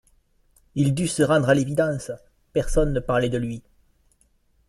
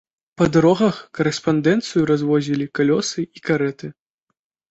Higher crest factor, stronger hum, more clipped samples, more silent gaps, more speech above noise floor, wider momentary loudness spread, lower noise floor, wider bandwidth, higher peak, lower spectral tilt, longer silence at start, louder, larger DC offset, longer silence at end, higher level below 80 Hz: about the same, 18 dB vs 16 dB; neither; neither; neither; second, 42 dB vs 58 dB; first, 14 LU vs 9 LU; second, -63 dBFS vs -77 dBFS; first, 13 kHz vs 8.2 kHz; about the same, -6 dBFS vs -4 dBFS; about the same, -6 dB/octave vs -6 dB/octave; first, 0.75 s vs 0.4 s; second, -23 LUFS vs -19 LUFS; neither; first, 1.1 s vs 0.8 s; first, -36 dBFS vs -54 dBFS